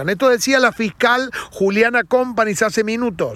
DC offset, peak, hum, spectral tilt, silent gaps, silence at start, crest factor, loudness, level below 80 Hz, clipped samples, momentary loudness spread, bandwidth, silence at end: under 0.1%; -2 dBFS; none; -3.5 dB/octave; none; 0 s; 16 dB; -17 LUFS; -52 dBFS; under 0.1%; 6 LU; 14.5 kHz; 0 s